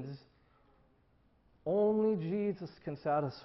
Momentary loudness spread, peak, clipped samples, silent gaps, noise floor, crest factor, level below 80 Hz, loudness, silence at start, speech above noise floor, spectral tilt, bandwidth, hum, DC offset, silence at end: 15 LU; -22 dBFS; under 0.1%; none; -69 dBFS; 14 dB; -70 dBFS; -34 LUFS; 0 s; 36 dB; -7.5 dB/octave; 6 kHz; none; under 0.1%; 0 s